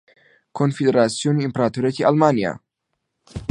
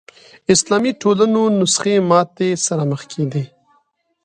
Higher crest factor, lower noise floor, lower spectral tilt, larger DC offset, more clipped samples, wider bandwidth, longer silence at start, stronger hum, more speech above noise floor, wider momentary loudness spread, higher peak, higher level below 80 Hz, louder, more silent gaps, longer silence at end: about the same, 20 dB vs 18 dB; first, -77 dBFS vs -62 dBFS; first, -6.5 dB/octave vs -4.5 dB/octave; neither; neither; about the same, 11 kHz vs 11 kHz; about the same, 0.55 s vs 0.5 s; neither; first, 58 dB vs 46 dB; first, 18 LU vs 8 LU; about the same, -2 dBFS vs 0 dBFS; first, -52 dBFS vs -60 dBFS; second, -19 LUFS vs -16 LUFS; neither; second, 0.05 s vs 0.8 s